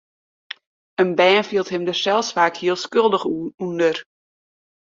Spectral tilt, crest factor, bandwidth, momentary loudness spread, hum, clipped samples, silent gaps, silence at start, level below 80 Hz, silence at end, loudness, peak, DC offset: -4 dB/octave; 18 dB; 7.6 kHz; 18 LU; none; under 0.1%; 3.54-3.58 s; 1 s; -68 dBFS; 0.85 s; -19 LUFS; -2 dBFS; under 0.1%